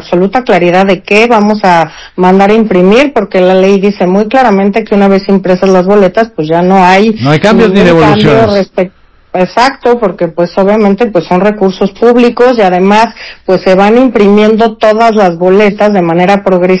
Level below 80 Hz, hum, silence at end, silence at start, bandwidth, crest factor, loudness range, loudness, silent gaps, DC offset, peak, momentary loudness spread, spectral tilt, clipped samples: -38 dBFS; none; 0 s; 0 s; 8 kHz; 6 dB; 2 LU; -7 LUFS; none; under 0.1%; 0 dBFS; 6 LU; -7 dB/octave; 10%